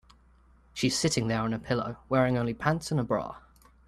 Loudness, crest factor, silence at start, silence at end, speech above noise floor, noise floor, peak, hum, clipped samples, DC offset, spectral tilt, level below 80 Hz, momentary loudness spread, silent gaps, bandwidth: -29 LUFS; 20 dB; 0.75 s; 0.5 s; 31 dB; -60 dBFS; -10 dBFS; none; under 0.1%; under 0.1%; -5 dB/octave; -54 dBFS; 7 LU; none; 14 kHz